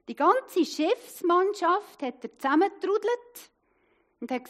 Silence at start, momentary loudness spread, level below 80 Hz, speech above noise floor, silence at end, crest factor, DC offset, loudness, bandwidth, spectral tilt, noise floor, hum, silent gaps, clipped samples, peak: 0.1 s; 12 LU; -82 dBFS; 42 dB; 0.05 s; 18 dB; under 0.1%; -27 LUFS; 15.5 kHz; -3 dB/octave; -68 dBFS; none; none; under 0.1%; -10 dBFS